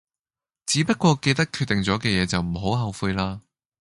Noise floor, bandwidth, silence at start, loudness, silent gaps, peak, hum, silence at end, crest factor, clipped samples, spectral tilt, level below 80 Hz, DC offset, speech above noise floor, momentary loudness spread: under -90 dBFS; 11.5 kHz; 0.65 s; -23 LUFS; none; -6 dBFS; none; 0.4 s; 18 dB; under 0.1%; -4.5 dB/octave; -44 dBFS; under 0.1%; over 67 dB; 8 LU